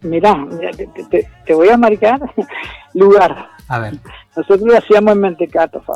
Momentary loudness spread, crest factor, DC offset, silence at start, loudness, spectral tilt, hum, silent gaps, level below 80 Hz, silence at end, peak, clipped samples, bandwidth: 17 LU; 10 dB; under 0.1%; 0.05 s; -12 LUFS; -7 dB/octave; none; none; -44 dBFS; 0 s; -2 dBFS; under 0.1%; 9 kHz